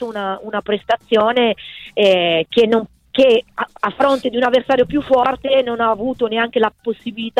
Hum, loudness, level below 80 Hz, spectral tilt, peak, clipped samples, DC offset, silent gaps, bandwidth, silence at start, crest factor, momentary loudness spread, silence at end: none; -17 LUFS; -50 dBFS; -5.5 dB/octave; -4 dBFS; under 0.1%; under 0.1%; none; 10.5 kHz; 0 s; 14 dB; 10 LU; 0 s